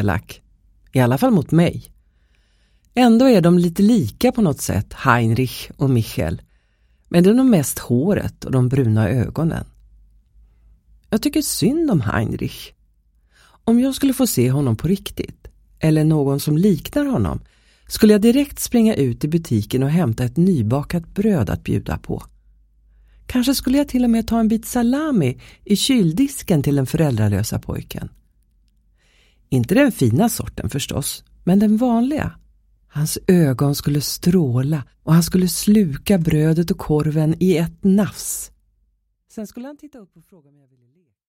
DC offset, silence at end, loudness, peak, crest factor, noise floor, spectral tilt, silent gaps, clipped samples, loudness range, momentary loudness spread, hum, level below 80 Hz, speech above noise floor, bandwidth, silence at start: under 0.1%; 1.25 s; -18 LUFS; 0 dBFS; 18 dB; -65 dBFS; -6 dB/octave; none; under 0.1%; 5 LU; 11 LU; none; -42 dBFS; 48 dB; 16.5 kHz; 0 s